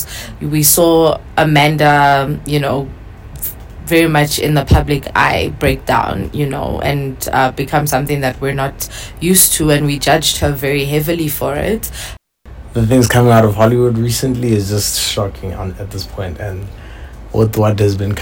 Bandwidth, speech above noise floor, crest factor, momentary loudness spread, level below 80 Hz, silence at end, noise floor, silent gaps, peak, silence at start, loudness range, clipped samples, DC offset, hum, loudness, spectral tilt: over 20 kHz; 21 dB; 12 dB; 15 LU; -30 dBFS; 0 s; -34 dBFS; none; -2 dBFS; 0 s; 4 LU; under 0.1%; under 0.1%; none; -14 LUFS; -4.5 dB/octave